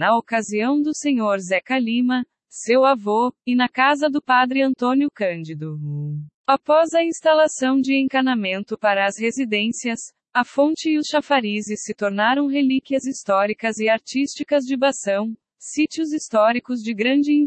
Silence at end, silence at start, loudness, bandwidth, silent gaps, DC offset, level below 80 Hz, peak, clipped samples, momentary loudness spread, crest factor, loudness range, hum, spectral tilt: 0 s; 0 s; -20 LUFS; 8.8 kHz; 6.34-6.44 s; under 0.1%; -70 dBFS; -4 dBFS; under 0.1%; 9 LU; 16 dB; 2 LU; none; -4.5 dB/octave